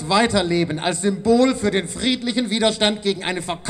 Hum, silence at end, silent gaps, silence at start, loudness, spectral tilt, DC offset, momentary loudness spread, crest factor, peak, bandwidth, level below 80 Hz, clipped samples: none; 0 s; none; 0 s; -19 LUFS; -4 dB/octave; under 0.1%; 6 LU; 18 dB; -2 dBFS; 13.5 kHz; -46 dBFS; under 0.1%